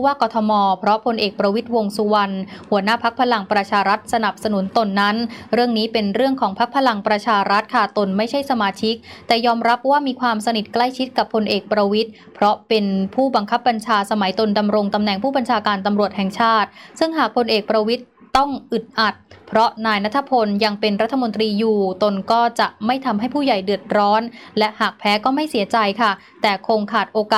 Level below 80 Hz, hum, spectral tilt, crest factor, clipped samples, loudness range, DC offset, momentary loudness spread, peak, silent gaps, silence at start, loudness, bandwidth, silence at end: -58 dBFS; none; -5.5 dB/octave; 14 dB; under 0.1%; 1 LU; under 0.1%; 4 LU; -4 dBFS; none; 0 s; -19 LUFS; 15 kHz; 0 s